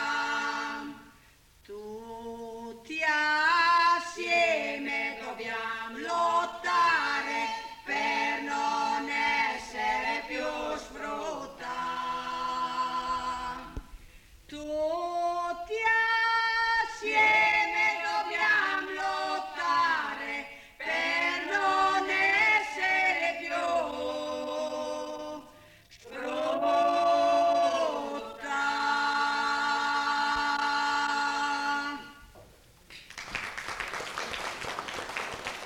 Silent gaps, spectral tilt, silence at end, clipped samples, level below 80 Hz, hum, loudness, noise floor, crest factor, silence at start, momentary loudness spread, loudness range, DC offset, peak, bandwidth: none; -2 dB/octave; 0 s; under 0.1%; -58 dBFS; none; -28 LUFS; -59 dBFS; 14 dB; 0 s; 14 LU; 8 LU; under 0.1%; -14 dBFS; 17 kHz